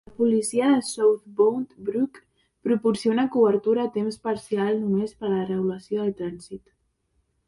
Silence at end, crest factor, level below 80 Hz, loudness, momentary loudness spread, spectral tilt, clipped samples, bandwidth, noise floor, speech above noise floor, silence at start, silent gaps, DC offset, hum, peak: 0.9 s; 16 dB; -64 dBFS; -24 LUFS; 10 LU; -6 dB/octave; under 0.1%; 11.5 kHz; -71 dBFS; 47 dB; 0.2 s; none; under 0.1%; none; -8 dBFS